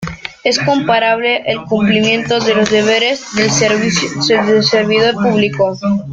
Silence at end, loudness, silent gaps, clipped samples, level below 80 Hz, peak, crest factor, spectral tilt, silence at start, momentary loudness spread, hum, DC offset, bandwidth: 0 s; -13 LUFS; none; under 0.1%; -48 dBFS; 0 dBFS; 14 dB; -4 dB/octave; 0 s; 5 LU; none; under 0.1%; 9 kHz